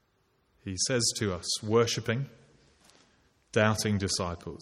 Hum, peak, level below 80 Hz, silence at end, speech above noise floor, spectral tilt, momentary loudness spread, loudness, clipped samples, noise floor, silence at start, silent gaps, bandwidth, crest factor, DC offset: none; -8 dBFS; -58 dBFS; 0 s; 42 dB; -4 dB/octave; 10 LU; -29 LUFS; under 0.1%; -71 dBFS; 0.65 s; none; 14.5 kHz; 22 dB; under 0.1%